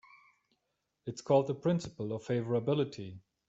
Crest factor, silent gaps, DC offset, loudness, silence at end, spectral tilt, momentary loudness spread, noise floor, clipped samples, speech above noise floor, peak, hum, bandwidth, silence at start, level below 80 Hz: 20 dB; none; under 0.1%; -33 LUFS; 0.3 s; -7 dB/octave; 16 LU; -83 dBFS; under 0.1%; 51 dB; -14 dBFS; none; 8.2 kHz; 1.05 s; -70 dBFS